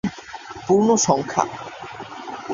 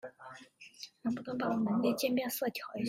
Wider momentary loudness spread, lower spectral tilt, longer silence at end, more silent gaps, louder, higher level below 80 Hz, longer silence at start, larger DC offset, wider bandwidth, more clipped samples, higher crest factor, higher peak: about the same, 18 LU vs 20 LU; about the same, -4.5 dB/octave vs -5 dB/octave; about the same, 0 s vs 0 s; neither; first, -19 LUFS vs -34 LUFS; first, -56 dBFS vs -76 dBFS; about the same, 0.05 s vs 0.05 s; neither; second, 7.6 kHz vs 16 kHz; neither; about the same, 20 dB vs 16 dB; first, -2 dBFS vs -18 dBFS